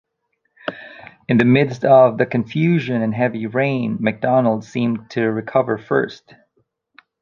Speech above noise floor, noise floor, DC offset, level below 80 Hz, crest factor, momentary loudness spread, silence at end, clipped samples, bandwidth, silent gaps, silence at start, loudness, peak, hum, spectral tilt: 54 dB; -71 dBFS; under 0.1%; -60 dBFS; 18 dB; 17 LU; 1.05 s; under 0.1%; 7.2 kHz; none; 0.65 s; -18 LUFS; 0 dBFS; none; -8 dB/octave